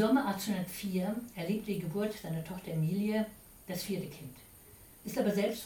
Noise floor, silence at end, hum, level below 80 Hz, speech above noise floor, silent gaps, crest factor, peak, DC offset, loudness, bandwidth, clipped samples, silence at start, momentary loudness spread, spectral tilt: -56 dBFS; 0 s; none; -64 dBFS; 22 dB; none; 18 dB; -18 dBFS; under 0.1%; -35 LUFS; 19 kHz; under 0.1%; 0 s; 18 LU; -6 dB/octave